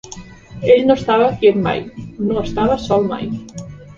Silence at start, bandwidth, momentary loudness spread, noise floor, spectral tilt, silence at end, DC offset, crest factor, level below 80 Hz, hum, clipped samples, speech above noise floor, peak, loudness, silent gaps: 0.05 s; 7.6 kHz; 20 LU; -36 dBFS; -6.5 dB/octave; 0.05 s; under 0.1%; 16 dB; -40 dBFS; none; under 0.1%; 21 dB; 0 dBFS; -16 LUFS; none